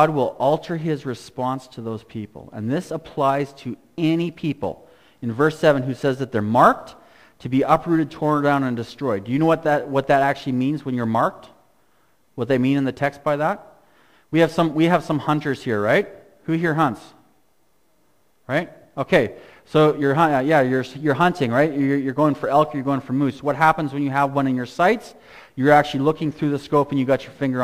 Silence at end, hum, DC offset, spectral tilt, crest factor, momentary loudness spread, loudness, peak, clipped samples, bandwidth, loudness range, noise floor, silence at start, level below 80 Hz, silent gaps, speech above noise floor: 0 s; none; under 0.1%; -7 dB/octave; 20 dB; 12 LU; -21 LUFS; -2 dBFS; under 0.1%; 15.5 kHz; 6 LU; -65 dBFS; 0 s; -54 dBFS; none; 45 dB